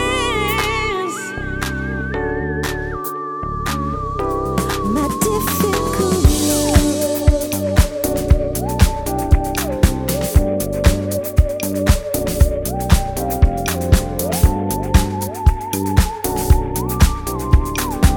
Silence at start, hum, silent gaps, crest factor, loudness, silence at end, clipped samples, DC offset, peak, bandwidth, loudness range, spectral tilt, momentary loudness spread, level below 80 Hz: 0 s; none; none; 16 dB; -18 LUFS; 0 s; under 0.1%; under 0.1%; 0 dBFS; over 20 kHz; 5 LU; -5 dB/octave; 6 LU; -20 dBFS